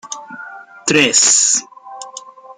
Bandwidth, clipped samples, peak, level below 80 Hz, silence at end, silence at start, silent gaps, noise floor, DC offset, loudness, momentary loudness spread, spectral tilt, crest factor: 15.5 kHz; under 0.1%; 0 dBFS; -64 dBFS; 0.05 s; 0.05 s; none; -36 dBFS; under 0.1%; -11 LUFS; 24 LU; -0.5 dB/octave; 18 dB